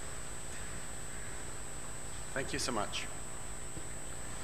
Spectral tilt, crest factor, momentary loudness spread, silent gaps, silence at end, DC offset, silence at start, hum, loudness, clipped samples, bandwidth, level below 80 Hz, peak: -2.5 dB/octave; 22 dB; 8 LU; none; 0 s; 0.9%; 0 s; none; -41 LUFS; under 0.1%; 14 kHz; -52 dBFS; -20 dBFS